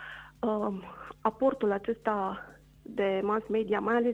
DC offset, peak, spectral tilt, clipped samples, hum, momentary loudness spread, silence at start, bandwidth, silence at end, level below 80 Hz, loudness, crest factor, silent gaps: under 0.1%; -12 dBFS; -7.5 dB/octave; under 0.1%; none; 14 LU; 0 s; 8.2 kHz; 0 s; -62 dBFS; -31 LUFS; 18 dB; none